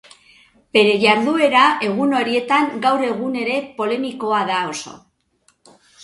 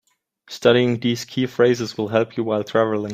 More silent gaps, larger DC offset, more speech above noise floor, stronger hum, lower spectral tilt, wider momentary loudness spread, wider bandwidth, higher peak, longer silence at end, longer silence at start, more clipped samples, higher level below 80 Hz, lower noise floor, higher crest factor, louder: neither; neither; first, 44 dB vs 31 dB; neither; second, -4 dB/octave vs -5.5 dB/octave; about the same, 9 LU vs 7 LU; second, 11.5 kHz vs 15.5 kHz; about the same, 0 dBFS vs -2 dBFS; first, 1.05 s vs 0 s; first, 0.75 s vs 0.5 s; neither; about the same, -64 dBFS vs -62 dBFS; first, -61 dBFS vs -50 dBFS; about the same, 18 dB vs 18 dB; first, -17 LUFS vs -20 LUFS